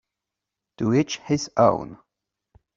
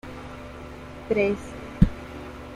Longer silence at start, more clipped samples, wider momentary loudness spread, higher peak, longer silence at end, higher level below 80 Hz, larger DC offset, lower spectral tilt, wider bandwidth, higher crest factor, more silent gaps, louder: first, 0.8 s vs 0.05 s; neither; second, 10 LU vs 16 LU; about the same, -4 dBFS vs -2 dBFS; first, 0.8 s vs 0 s; second, -58 dBFS vs -34 dBFS; neither; second, -6 dB/octave vs -8 dB/octave; second, 7.8 kHz vs 12.5 kHz; about the same, 22 dB vs 24 dB; neither; about the same, -23 LUFS vs -25 LUFS